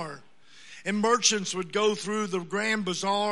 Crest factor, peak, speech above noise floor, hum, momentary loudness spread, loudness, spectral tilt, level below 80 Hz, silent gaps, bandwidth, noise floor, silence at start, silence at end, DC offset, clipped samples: 20 dB; -8 dBFS; 28 dB; none; 15 LU; -26 LUFS; -2.5 dB/octave; -78 dBFS; none; 11.5 kHz; -55 dBFS; 0 s; 0 s; 0.3%; under 0.1%